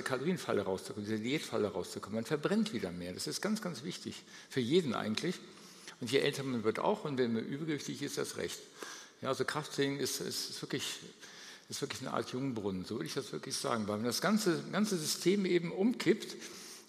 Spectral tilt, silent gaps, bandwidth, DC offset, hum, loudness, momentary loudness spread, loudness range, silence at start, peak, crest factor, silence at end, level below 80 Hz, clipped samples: -4.5 dB/octave; none; 15.5 kHz; under 0.1%; none; -36 LUFS; 13 LU; 5 LU; 0 s; -16 dBFS; 20 dB; 0.05 s; -78 dBFS; under 0.1%